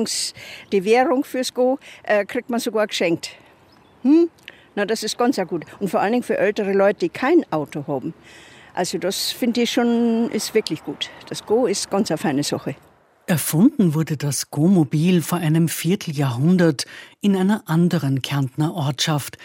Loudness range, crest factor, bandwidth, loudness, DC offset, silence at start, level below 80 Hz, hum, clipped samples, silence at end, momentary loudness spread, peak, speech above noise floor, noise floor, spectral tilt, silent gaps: 3 LU; 18 dB; 16 kHz; -20 LUFS; under 0.1%; 0 s; -64 dBFS; none; under 0.1%; 0 s; 10 LU; -2 dBFS; 32 dB; -52 dBFS; -5.5 dB/octave; none